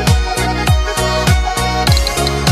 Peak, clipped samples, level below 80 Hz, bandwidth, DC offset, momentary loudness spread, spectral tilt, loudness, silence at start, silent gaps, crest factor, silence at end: 0 dBFS; under 0.1%; -18 dBFS; 15.5 kHz; under 0.1%; 2 LU; -4.5 dB/octave; -14 LUFS; 0 s; none; 12 dB; 0 s